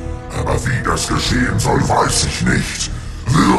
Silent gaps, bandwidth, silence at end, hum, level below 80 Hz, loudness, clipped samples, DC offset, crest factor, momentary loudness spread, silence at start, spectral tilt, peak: none; 13 kHz; 0 s; none; -26 dBFS; -17 LUFS; under 0.1%; under 0.1%; 16 dB; 9 LU; 0 s; -4.5 dB/octave; 0 dBFS